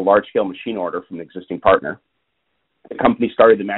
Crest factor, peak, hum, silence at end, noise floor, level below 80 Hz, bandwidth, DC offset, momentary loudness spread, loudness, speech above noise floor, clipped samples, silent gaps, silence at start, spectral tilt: 18 dB; 0 dBFS; none; 0 s; -72 dBFS; -52 dBFS; 4.1 kHz; under 0.1%; 19 LU; -18 LUFS; 54 dB; under 0.1%; none; 0 s; -4 dB/octave